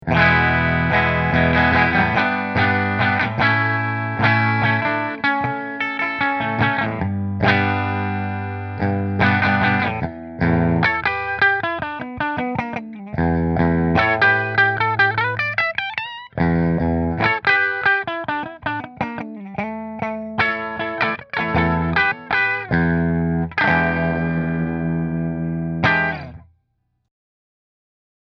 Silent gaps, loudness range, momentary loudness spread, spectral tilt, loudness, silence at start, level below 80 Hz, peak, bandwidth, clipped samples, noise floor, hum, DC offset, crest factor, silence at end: none; 5 LU; 10 LU; -8 dB/octave; -19 LUFS; 0.05 s; -40 dBFS; 0 dBFS; 6.2 kHz; under 0.1%; -69 dBFS; none; under 0.1%; 20 dB; 1.85 s